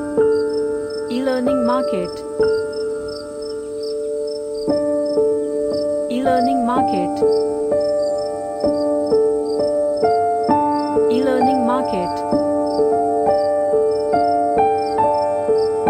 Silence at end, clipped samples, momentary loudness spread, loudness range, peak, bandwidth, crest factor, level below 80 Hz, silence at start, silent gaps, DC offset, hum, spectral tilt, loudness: 0 s; under 0.1%; 8 LU; 4 LU; -4 dBFS; 9.8 kHz; 14 dB; -50 dBFS; 0 s; none; under 0.1%; none; -6 dB/octave; -19 LUFS